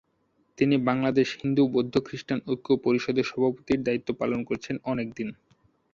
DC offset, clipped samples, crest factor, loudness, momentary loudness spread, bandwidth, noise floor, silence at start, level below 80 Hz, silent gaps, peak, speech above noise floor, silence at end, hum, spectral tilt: under 0.1%; under 0.1%; 18 dB; -27 LUFS; 8 LU; 7.4 kHz; -70 dBFS; 0.6 s; -60 dBFS; none; -8 dBFS; 44 dB; 0.6 s; none; -7 dB/octave